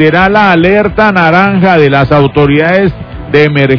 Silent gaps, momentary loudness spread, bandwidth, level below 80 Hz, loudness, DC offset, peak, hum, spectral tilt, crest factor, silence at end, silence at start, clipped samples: none; 4 LU; 5.4 kHz; -30 dBFS; -7 LUFS; under 0.1%; 0 dBFS; none; -8 dB/octave; 6 dB; 0 s; 0 s; 5%